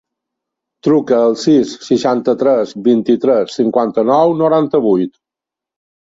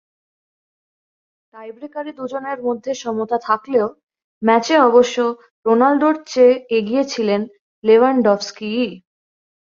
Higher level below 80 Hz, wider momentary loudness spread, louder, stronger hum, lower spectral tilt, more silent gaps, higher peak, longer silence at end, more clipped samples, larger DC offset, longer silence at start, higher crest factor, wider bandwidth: first, -58 dBFS vs -66 dBFS; second, 4 LU vs 14 LU; first, -13 LUFS vs -17 LUFS; neither; first, -6.5 dB/octave vs -5 dB/octave; second, none vs 4.03-4.07 s, 4.24-4.41 s, 5.51-5.63 s, 7.59-7.82 s; about the same, -2 dBFS vs -2 dBFS; first, 1.05 s vs 0.75 s; neither; neither; second, 0.85 s vs 1.55 s; about the same, 12 dB vs 16 dB; about the same, 7.8 kHz vs 7.4 kHz